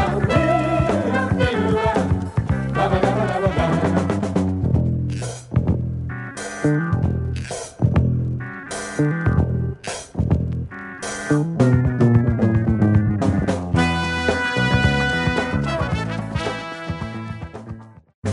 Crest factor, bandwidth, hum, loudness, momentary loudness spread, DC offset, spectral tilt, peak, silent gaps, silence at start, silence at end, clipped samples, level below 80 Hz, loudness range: 16 dB; 11.5 kHz; none; -21 LUFS; 12 LU; under 0.1%; -6.5 dB/octave; -2 dBFS; 18.14-18.22 s; 0 s; 0 s; under 0.1%; -34 dBFS; 4 LU